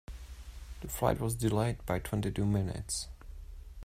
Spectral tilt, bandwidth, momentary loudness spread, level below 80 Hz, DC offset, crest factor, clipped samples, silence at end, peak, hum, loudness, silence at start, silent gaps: -5.5 dB/octave; 16 kHz; 19 LU; -46 dBFS; under 0.1%; 20 dB; under 0.1%; 0 s; -14 dBFS; none; -33 LUFS; 0.1 s; none